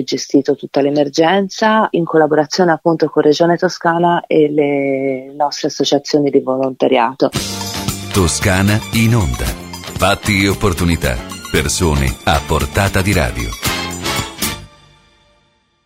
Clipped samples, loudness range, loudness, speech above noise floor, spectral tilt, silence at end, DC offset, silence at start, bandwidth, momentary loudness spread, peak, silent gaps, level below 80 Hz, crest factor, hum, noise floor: under 0.1%; 3 LU; -15 LUFS; 44 dB; -5 dB/octave; 1.2 s; under 0.1%; 0 s; 16.5 kHz; 7 LU; 0 dBFS; none; -30 dBFS; 14 dB; none; -58 dBFS